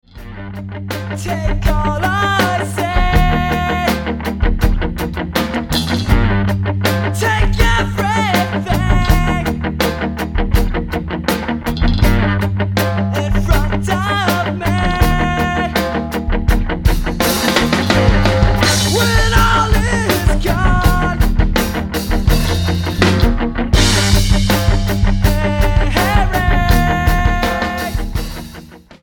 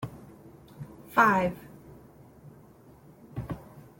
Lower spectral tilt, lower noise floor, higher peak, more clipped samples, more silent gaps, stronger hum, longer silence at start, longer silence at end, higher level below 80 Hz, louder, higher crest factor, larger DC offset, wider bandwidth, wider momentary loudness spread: second, -5 dB/octave vs -6.5 dB/octave; second, -36 dBFS vs -54 dBFS; first, 0 dBFS vs -8 dBFS; neither; neither; neither; first, 0.15 s vs 0 s; about the same, 0.25 s vs 0.2 s; first, -18 dBFS vs -58 dBFS; first, -15 LUFS vs -27 LUFS; second, 14 dB vs 24 dB; neither; about the same, 17.5 kHz vs 17 kHz; second, 7 LU vs 27 LU